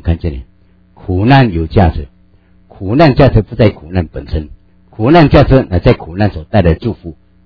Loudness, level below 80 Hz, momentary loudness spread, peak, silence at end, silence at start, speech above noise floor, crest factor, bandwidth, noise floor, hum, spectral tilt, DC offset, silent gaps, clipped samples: -11 LUFS; -24 dBFS; 19 LU; 0 dBFS; 0.35 s; 0.05 s; 37 dB; 12 dB; 5.4 kHz; -47 dBFS; none; -9.5 dB/octave; under 0.1%; none; 1%